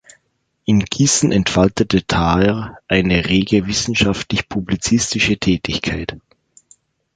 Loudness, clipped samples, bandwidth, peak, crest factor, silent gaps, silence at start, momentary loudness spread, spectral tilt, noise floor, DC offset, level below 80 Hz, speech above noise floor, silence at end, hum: -17 LUFS; under 0.1%; 9.4 kHz; -2 dBFS; 16 dB; none; 0.7 s; 7 LU; -4.5 dB/octave; -67 dBFS; under 0.1%; -36 dBFS; 51 dB; 0.95 s; none